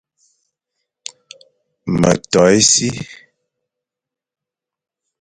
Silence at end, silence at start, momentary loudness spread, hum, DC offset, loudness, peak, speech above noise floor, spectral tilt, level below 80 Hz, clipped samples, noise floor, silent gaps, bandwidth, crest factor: 2.05 s; 1.85 s; 24 LU; none; under 0.1%; -13 LUFS; 0 dBFS; 72 dB; -3.5 dB/octave; -48 dBFS; under 0.1%; -86 dBFS; none; 11.5 kHz; 20 dB